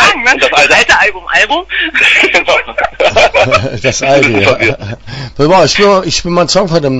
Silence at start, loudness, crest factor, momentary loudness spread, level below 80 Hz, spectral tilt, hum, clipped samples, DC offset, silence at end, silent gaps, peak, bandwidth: 0 s; -8 LUFS; 10 dB; 8 LU; -34 dBFS; -3.5 dB/octave; none; 0.8%; under 0.1%; 0 s; none; 0 dBFS; 11 kHz